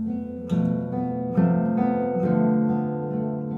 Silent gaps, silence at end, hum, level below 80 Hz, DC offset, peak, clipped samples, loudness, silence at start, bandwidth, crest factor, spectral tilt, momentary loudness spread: none; 0 s; none; -58 dBFS; under 0.1%; -10 dBFS; under 0.1%; -24 LUFS; 0 s; 4.1 kHz; 14 dB; -11 dB/octave; 6 LU